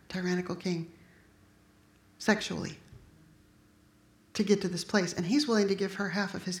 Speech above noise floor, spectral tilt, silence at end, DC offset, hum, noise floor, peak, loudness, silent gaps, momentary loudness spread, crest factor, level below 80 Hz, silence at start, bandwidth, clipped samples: 32 dB; -5 dB/octave; 0 s; under 0.1%; none; -62 dBFS; -12 dBFS; -31 LUFS; none; 11 LU; 22 dB; -66 dBFS; 0.1 s; 16 kHz; under 0.1%